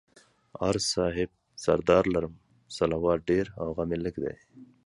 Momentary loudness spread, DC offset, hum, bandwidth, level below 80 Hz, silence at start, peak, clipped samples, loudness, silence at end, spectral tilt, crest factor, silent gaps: 13 LU; under 0.1%; none; 11.5 kHz; -50 dBFS; 0.55 s; -8 dBFS; under 0.1%; -28 LUFS; 0.2 s; -5 dB/octave; 22 dB; none